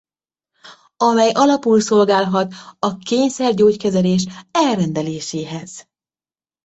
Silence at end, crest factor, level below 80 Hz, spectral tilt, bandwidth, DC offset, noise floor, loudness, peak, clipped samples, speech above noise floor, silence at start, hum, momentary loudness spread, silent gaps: 0.85 s; 16 dB; -58 dBFS; -5.5 dB/octave; 8.2 kHz; under 0.1%; under -90 dBFS; -17 LUFS; -2 dBFS; under 0.1%; over 74 dB; 0.65 s; none; 12 LU; none